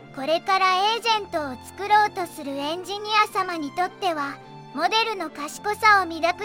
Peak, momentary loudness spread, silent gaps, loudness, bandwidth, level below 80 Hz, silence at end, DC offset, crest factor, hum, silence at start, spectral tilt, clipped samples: -6 dBFS; 12 LU; none; -23 LUFS; 17 kHz; -66 dBFS; 0 s; under 0.1%; 18 dB; none; 0 s; -2.5 dB/octave; under 0.1%